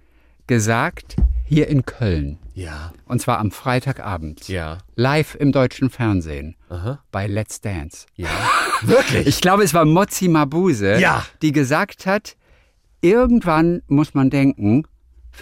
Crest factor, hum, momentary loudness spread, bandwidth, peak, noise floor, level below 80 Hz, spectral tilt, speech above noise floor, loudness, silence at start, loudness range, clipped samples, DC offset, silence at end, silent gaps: 14 dB; none; 14 LU; 16.5 kHz; -4 dBFS; -55 dBFS; -34 dBFS; -6 dB/octave; 37 dB; -18 LUFS; 0.5 s; 7 LU; under 0.1%; under 0.1%; 0 s; none